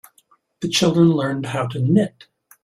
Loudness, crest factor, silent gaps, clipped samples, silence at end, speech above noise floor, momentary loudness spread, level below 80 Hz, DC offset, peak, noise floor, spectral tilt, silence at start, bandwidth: -19 LUFS; 16 dB; none; under 0.1%; 0.55 s; 41 dB; 10 LU; -58 dBFS; under 0.1%; -4 dBFS; -59 dBFS; -5.5 dB/octave; 0.6 s; 14.5 kHz